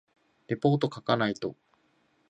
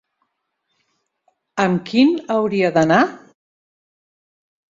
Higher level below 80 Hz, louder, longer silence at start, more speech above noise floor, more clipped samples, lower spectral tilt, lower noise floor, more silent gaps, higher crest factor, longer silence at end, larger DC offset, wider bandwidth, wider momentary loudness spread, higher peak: second, -70 dBFS vs -60 dBFS; second, -29 LUFS vs -17 LUFS; second, 0.5 s vs 1.55 s; second, 41 dB vs 57 dB; neither; about the same, -7 dB/octave vs -6 dB/octave; second, -69 dBFS vs -73 dBFS; neither; about the same, 20 dB vs 18 dB; second, 0.75 s vs 1.55 s; neither; first, 8.4 kHz vs 7.6 kHz; first, 10 LU vs 7 LU; second, -10 dBFS vs -2 dBFS